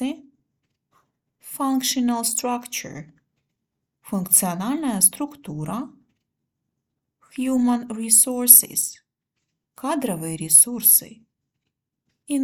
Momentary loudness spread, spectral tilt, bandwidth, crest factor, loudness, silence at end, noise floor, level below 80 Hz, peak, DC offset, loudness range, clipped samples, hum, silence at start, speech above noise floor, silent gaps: 20 LU; -2.5 dB/octave; 19 kHz; 24 dB; -17 LUFS; 0 s; -80 dBFS; -66 dBFS; 0 dBFS; under 0.1%; 10 LU; under 0.1%; none; 0 s; 60 dB; none